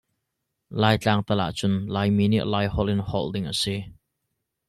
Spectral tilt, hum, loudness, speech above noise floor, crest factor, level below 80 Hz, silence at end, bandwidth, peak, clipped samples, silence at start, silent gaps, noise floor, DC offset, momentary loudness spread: -6 dB/octave; none; -24 LUFS; 57 dB; 20 dB; -46 dBFS; 0.8 s; 13 kHz; -6 dBFS; under 0.1%; 0.7 s; none; -80 dBFS; under 0.1%; 7 LU